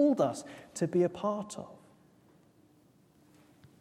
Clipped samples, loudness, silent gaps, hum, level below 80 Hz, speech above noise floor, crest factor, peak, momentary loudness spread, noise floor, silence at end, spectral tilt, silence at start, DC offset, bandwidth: under 0.1%; -33 LUFS; none; none; -76 dBFS; 34 dB; 20 dB; -14 dBFS; 16 LU; -64 dBFS; 2.05 s; -6.5 dB/octave; 0 s; under 0.1%; 13.5 kHz